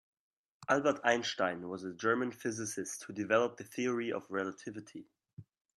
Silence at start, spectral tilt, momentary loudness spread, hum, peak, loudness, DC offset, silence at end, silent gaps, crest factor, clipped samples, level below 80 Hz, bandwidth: 0.6 s; -4 dB/octave; 15 LU; none; -14 dBFS; -34 LUFS; under 0.1%; 0.35 s; 5.33-5.37 s; 22 dB; under 0.1%; -80 dBFS; 13 kHz